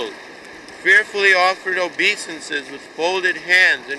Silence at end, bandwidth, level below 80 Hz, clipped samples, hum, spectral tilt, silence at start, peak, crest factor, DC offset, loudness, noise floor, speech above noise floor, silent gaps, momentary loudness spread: 0 s; 12 kHz; -66 dBFS; under 0.1%; none; -1.5 dB/octave; 0 s; -4 dBFS; 16 dB; under 0.1%; -16 LUFS; -38 dBFS; 20 dB; none; 22 LU